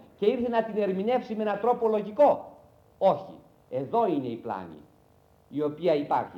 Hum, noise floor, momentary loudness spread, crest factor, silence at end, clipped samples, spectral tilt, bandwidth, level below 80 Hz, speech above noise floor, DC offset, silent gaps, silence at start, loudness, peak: none; -60 dBFS; 14 LU; 16 dB; 0 s; under 0.1%; -8 dB/octave; 7 kHz; -68 dBFS; 34 dB; under 0.1%; none; 0.2 s; -27 LUFS; -10 dBFS